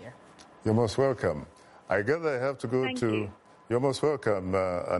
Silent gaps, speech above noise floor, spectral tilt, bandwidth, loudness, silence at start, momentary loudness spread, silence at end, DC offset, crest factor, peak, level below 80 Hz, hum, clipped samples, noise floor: none; 25 dB; -6.5 dB/octave; 11.5 kHz; -29 LUFS; 0 s; 8 LU; 0 s; under 0.1%; 16 dB; -14 dBFS; -60 dBFS; none; under 0.1%; -53 dBFS